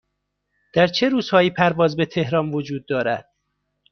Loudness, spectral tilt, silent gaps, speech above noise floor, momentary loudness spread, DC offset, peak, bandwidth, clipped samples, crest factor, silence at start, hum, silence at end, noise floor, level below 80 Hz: -20 LUFS; -6.5 dB/octave; none; 56 dB; 8 LU; under 0.1%; -2 dBFS; 6.6 kHz; under 0.1%; 18 dB; 0.75 s; 50 Hz at -45 dBFS; 0.7 s; -76 dBFS; -56 dBFS